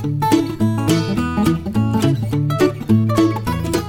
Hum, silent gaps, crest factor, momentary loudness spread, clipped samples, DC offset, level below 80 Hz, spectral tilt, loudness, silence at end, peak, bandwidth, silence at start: none; none; 14 dB; 4 LU; under 0.1%; under 0.1%; -38 dBFS; -6.5 dB/octave; -17 LUFS; 0 s; -2 dBFS; 17 kHz; 0 s